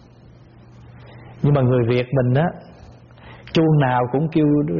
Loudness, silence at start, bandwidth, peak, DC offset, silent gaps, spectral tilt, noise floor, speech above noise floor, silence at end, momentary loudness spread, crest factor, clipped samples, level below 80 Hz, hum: -18 LUFS; 0.9 s; 6.6 kHz; -6 dBFS; under 0.1%; none; -7 dB/octave; -46 dBFS; 29 dB; 0 s; 7 LU; 14 dB; under 0.1%; -48 dBFS; none